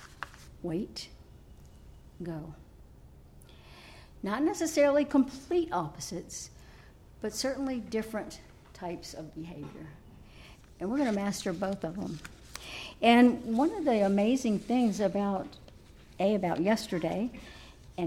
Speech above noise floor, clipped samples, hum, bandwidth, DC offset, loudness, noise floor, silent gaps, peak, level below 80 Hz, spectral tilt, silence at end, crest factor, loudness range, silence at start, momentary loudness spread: 24 dB; under 0.1%; none; 16 kHz; under 0.1%; -30 LUFS; -54 dBFS; none; -10 dBFS; -56 dBFS; -5 dB/octave; 0 s; 22 dB; 14 LU; 0 s; 20 LU